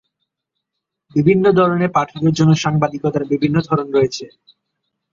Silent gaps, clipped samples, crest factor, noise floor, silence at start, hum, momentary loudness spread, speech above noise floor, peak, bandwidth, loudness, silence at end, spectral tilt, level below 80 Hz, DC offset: none; under 0.1%; 16 dB; -79 dBFS; 1.15 s; none; 7 LU; 63 dB; -2 dBFS; 7.6 kHz; -16 LUFS; 0.85 s; -7 dB/octave; -52 dBFS; under 0.1%